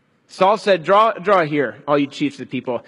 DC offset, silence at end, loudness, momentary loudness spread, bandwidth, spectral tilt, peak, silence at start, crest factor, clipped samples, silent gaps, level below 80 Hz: under 0.1%; 0.05 s; -18 LUFS; 10 LU; 11.5 kHz; -6 dB/octave; -2 dBFS; 0.35 s; 18 dB; under 0.1%; none; -64 dBFS